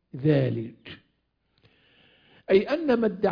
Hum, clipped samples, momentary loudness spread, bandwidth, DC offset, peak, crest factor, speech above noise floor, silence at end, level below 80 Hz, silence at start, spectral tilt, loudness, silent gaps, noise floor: none; under 0.1%; 19 LU; 5.2 kHz; under 0.1%; -8 dBFS; 18 dB; 50 dB; 0 s; -60 dBFS; 0.15 s; -9.5 dB/octave; -24 LUFS; none; -73 dBFS